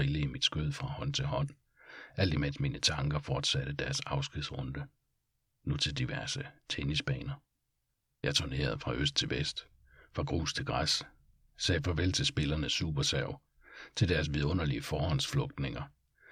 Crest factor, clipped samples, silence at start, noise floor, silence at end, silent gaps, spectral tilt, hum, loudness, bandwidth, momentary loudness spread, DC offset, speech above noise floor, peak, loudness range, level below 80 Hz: 20 dB; under 0.1%; 0 s; -81 dBFS; 0 s; none; -4.5 dB/octave; none; -33 LUFS; 15 kHz; 12 LU; under 0.1%; 48 dB; -14 dBFS; 4 LU; -48 dBFS